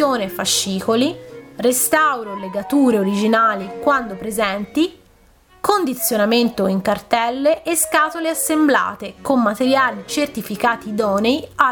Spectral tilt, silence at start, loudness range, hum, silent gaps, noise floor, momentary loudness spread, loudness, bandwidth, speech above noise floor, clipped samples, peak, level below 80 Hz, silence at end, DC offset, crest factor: -3.5 dB/octave; 0 s; 2 LU; none; none; -52 dBFS; 7 LU; -18 LUFS; 19 kHz; 34 dB; under 0.1%; 0 dBFS; -54 dBFS; 0 s; under 0.1%; 18 dB